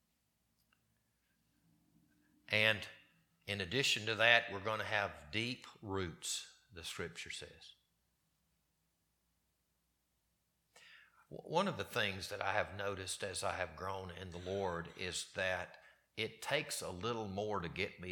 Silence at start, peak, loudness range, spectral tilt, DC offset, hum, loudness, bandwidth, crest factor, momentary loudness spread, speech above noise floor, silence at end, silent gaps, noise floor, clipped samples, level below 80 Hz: 2.5 s; -12 dBFS; 12 LU; -3 dB/octave; under 0.1%; none; -38 LUFS; 19 kHz; 30 dB; 16 LU; 43 dB; 0 s; none; -82 dBFS; under 0.1%; -70 dBFS